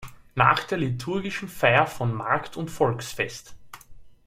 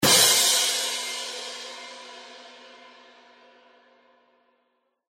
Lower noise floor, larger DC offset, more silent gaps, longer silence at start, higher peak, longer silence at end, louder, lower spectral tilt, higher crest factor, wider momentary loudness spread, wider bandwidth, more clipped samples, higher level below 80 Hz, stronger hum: second, -44 dBFS vs -73 dBFS; neither; neither; about the same, 0 s vs 0 s; about the same, -4 dBFS vs -4 dBFS; second, 0.1 s vs 2.6 s; second, -24 LUFS vs -20 LUFS; first, -5.5 dB/octave vs 0 dB/octave; about the same, 22 dB vs 24 dB; second, 11 LU vs 27 LU; about the same, 16 kHz vs 16.5 kHz; neither; first, -54 dBFS vs -70 dBFS; neither